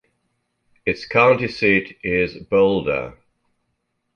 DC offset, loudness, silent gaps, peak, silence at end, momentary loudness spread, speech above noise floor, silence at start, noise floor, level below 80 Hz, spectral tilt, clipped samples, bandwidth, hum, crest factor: under 0.1%; -19 LUFS; none; -2 dBFS; 1.05 s; 10 LU; 54 dB; 0.85 s; -73 dBFS; -50 dBFS; -7 dB/octave; under 0.1%; 6.8 kHz; none; 20 dB